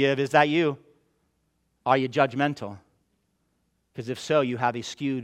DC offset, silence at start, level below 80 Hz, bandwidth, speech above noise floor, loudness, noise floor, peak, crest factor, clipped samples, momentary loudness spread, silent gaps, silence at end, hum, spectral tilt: under 0.1%; 0 s; -70 dBFS; 13.5 kHz; 48 dB; -25 LUFS; -72 dBFS; -4 dBFS; 22 dB; under 0.1%; 17 LU; none; 0 s; none; -5.5 dB/octave